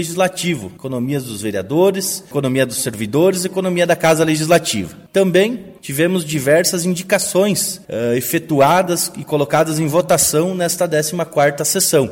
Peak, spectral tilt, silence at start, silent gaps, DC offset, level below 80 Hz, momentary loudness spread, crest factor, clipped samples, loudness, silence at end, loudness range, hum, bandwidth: 0 dBFS; -4 dB/octave; 0 s; none; under 0.1%; -54 dBFS; 8 LU; 16 dB; under 0.1%; -16 LUFS; 0 s; 2 LU; none; 16.5 kHz